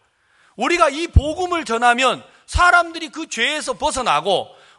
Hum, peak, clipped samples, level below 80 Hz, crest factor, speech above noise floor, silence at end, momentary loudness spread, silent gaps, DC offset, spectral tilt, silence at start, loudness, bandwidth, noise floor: none; 0 dBFS; under 0.1%; -30 dBFS; 18 dB; 40 dB; 0.35 s; 12 LU; none; under 0.1%; -4 dB/octave; 0.6 s; -18 LUFS; 11.5 kHz; -58 dBFS